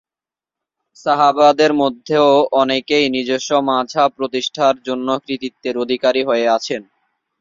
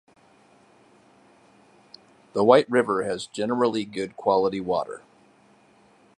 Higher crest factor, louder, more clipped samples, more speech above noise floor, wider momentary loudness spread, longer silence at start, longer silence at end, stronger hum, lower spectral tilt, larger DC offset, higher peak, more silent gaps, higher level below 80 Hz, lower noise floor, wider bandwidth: second, 16 dB vs 24 dB; first, -16 LUFS vs -23 LUFS; neither; first, 74 dB vs 35 dB; second, 11 LU vs 14 LU; second, 1.05 s vs 2.35 s; second, 0.6 s vs 1.2 s; neither; second, -4 dB/octave vs -5.5 dB/octave; neither; about the same, -2 dBFS vs -2 dBFS; neither; about the same, -62 dBFS vs -66 dBFS; first, -90 dBFS vs -58 dBFS; second, 7.6 kHz vs 11 kHz